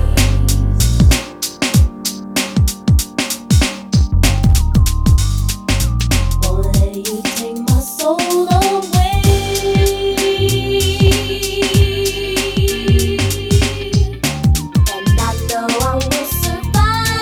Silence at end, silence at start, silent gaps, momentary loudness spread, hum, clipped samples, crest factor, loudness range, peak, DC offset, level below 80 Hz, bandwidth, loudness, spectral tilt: 0 s; 0 s; none; 5 LU; none; under 0.1%; 12 dB; 2 LU; -2 dBFS; under 0.1%; -18 dBFS; 19.5 kHz; -15 LUFS; -5 dB/octave